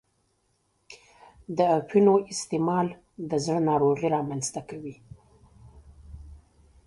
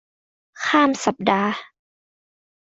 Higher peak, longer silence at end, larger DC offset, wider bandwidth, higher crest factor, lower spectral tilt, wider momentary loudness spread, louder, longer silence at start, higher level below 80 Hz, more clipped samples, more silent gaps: second, -8 dBFS vs -2 dBFS; second, 0.5 s vs 1.05 s; neither; first, 11.5 kHz vs 8.2 kHz; about the same, 20 dB vs 22 dB; first, -6 dB/octave vs -4 dB/octave; first, 19 LU vs 10 LU; second, -25 LUFS vs -20 LUFS; first, 0.9 s vs 0.55 s; first, -56 dBFS vs -64 dBFS; neither; neither